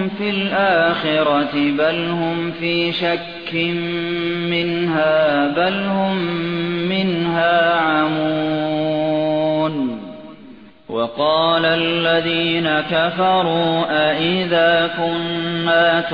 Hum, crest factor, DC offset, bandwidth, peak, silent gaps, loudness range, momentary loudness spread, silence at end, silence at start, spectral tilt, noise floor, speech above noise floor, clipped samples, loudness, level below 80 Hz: none; 14 dB; 0.3%; 5.2 kHz; -4 dBFS; none; 3 LU; 6 LU; 0 s; 0 s; -8 dB/octave; -42 dBFS; 24 dB; under 0.1%; -18 LUFS; -56 dBFS